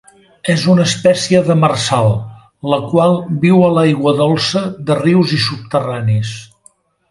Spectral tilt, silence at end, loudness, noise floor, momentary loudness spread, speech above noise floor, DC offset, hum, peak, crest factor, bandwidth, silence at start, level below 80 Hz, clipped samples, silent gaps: -6 dB/octave; 0.65 s; -13 LUFS; -51 dBFS; 8 LU; 38 dB; under 0.1%; none; 0 dBFS; 14 dB; 11.5 kHz; 0.45 s; -48 dBFS; under 0.1%; none